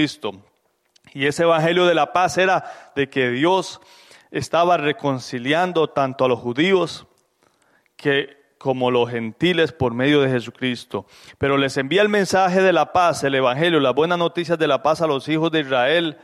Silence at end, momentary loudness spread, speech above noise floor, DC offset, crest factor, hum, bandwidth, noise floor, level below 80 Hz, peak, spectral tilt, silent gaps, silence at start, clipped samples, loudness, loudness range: 0.1 s; 9 LU; 43 dB; under 0.1%; 14 dB; none; 14 kHz; -62 dBFS; -58 dBFS; -6 dBFS; -5 dB/octave; none; 0 s; under 0.1%; -19 LUFS; 4 LU